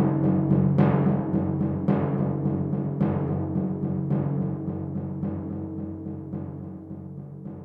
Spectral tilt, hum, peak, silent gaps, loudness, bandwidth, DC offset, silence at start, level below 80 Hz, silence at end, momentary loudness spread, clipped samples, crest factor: -12.5 dB/octave; none; -8 dBFS; none; -26 LUFS; 3.5 kHz; under 0.1%; 0 s; -54 dBFS; 0 s; 16 LU; under 0.1%; 18 dB